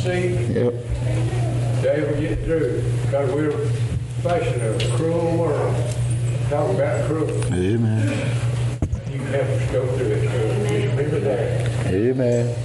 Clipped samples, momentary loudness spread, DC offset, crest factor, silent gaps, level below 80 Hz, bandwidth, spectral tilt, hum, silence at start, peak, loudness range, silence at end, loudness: under 0.1%; 3 LU; under 0.1%; 12 dB; none; -38 dBFS; 11.5 kHz; -7 dB/octave; none; 0 s; -8 dBFS; 1 LU; 0 s; -21 LUFS